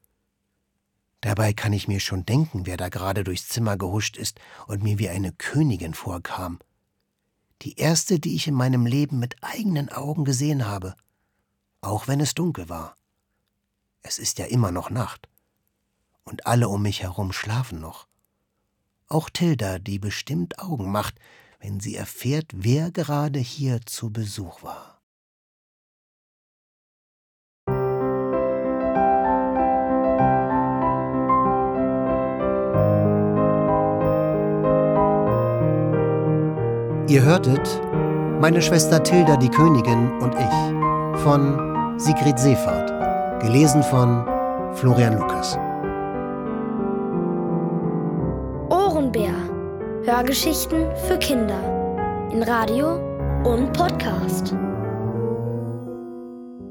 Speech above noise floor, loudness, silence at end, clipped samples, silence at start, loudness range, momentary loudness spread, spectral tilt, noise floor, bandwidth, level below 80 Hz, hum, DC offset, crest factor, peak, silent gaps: 55 dB; -22 LUFS; 0 s; under 0.1%; 1.25 s; 10 LU; 13 LU; -6 dB/octave; -76 dBFS; 19.5 kHz; -42 dBFS; none; under 0.1%; 20 dB; -2 dBFS; 25.03-27.67 s